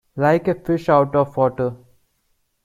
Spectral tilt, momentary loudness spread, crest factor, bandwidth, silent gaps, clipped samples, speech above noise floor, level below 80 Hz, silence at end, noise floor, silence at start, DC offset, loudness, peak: -8.5 dB/octave; 7 LU; 18 dB; 14.5 kHz; none; under 0.1%; 49 dB; -52 dBFS; 0.9 s; -67 dBFS; 0.15 s; under 0.1%; -19 LUFS; -2 dBFS